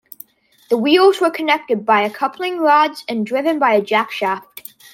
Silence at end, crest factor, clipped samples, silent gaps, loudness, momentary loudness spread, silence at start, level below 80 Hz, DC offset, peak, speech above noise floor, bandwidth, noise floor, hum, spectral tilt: 0.5 s; 16 dB; under 0.1%; none; -16 LUFS; 10 LU; 0.7 s; -70 dBFS; under 0.1%; -2 dBFS; 28 dB; 16.5 kHz; -44 dBFS; none; -4.5 dB/octave